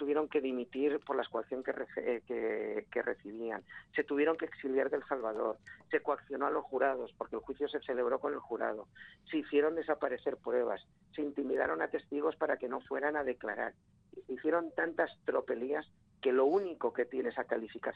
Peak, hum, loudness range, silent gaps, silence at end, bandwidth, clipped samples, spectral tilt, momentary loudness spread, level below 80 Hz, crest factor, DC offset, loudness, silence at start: -18 dBFS; none; 2 LU; none; 0 s; 5 kHz; under 0.1%; -7 dB/octave; 9 LU; -74 dBFS; 18 dB; under 0.1%; -35 LUFS; 0 s